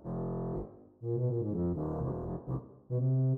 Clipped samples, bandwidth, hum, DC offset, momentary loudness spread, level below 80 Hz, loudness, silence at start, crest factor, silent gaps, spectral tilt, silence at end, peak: under 0.1%; 1.9 kHz; none; under 0.1%; 9 LU; -52 dBFS; -35 LUFS; 0 s; 10 dB; none; -14 dB/octave; 0 s; -22 dBFS